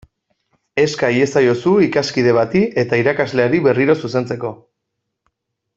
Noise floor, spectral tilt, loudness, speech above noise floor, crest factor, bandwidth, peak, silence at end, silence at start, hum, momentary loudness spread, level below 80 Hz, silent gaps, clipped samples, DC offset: -76 dBFS; -6 dB/octave; -16 LUFS; 61 dB; 14 dB; 8 kHz; -2 dBFS; 1.2 s; 0.75 s; none; 7 LU; -54 dBFS; none; under 0.1%; under 0.1%